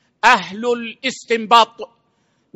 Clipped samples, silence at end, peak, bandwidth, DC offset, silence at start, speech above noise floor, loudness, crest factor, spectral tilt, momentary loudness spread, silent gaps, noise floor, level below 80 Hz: 0.1%; 0.7 s; 0 dBFS; 14 kHz; under 0.1%; 0.25 s; 47 dB; -16 LUFS; 18 dB; -2.5 dB/octave; 14 LU; none; -64 dBFS; -60 dBFS